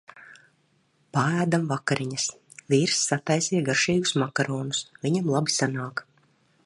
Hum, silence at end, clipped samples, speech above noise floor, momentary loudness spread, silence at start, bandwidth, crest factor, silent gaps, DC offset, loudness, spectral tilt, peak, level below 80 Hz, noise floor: none; 0.65 s; under 0.1%; 42 dB; 8 LU; 0.15 s; 11.5 kHz; 20 dB; none; under 0.1%; -25 LUFS; -4 dB/octave; -8 dBFS; -66 dBFS; -67 dBFS